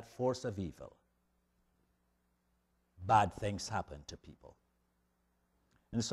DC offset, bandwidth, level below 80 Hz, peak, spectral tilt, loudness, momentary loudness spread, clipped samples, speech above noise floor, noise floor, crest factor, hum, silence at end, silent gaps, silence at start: under 0.1%; 13 kHz; -62 dBFS; -16 dBFS; -5 dB/octave; -36 LUFS; 23 LU; under 0.1%; 42 dB; -78 dBFS; 24 dB; 60 Hz at -75 dBFS; 0 s; none; 0 s